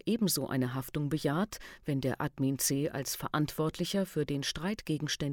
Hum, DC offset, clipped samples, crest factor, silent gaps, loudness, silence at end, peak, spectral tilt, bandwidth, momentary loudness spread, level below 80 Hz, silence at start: none; under 0.1%; under 0.1%; 14 dB; none; -33 LUFS; 0 s; -18 dBFS; -4.5 dB/octave; 19.5 kHz; 5 LU; -58 dBFS; 0.05 s